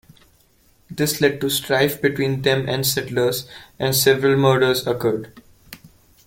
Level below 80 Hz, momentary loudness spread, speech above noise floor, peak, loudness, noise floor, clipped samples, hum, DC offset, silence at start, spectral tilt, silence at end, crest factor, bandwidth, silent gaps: -54 dBFS; 9 LU; 38 dB; -2 dBFS; -19 LUFS; -57 dBFS; under 0.1%; none; under 0.1%; 0.9 s; -4 dB/octave; 0.4 s; 20 dB; 17 kHz; none